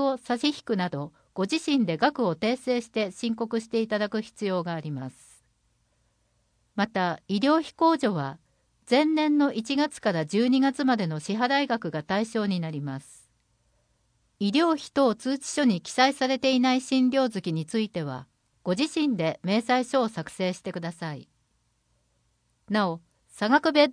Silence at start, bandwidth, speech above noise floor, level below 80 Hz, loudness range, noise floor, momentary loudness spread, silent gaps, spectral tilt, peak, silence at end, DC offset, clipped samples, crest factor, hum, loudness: 0 s; 10.5 kHz; 45 dB; -70 dBFS; 7 LU; -71 dBFS; 11 LU; none; -5 dB/octave; -8 dBFS; 0 s; under 0.1%; under 0.1%; 20 dB; none; -26 LUFS